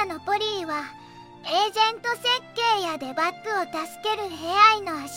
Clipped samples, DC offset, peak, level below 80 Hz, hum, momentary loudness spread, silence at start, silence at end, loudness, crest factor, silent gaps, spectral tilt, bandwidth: under 0.1%; under 0.1%; -4 dBFS; -68 dBFS; none; 13 LU; 0 s; 0 s; -23 LUFS; 22 dB; none; -2 dB/octave; 16.5 kHz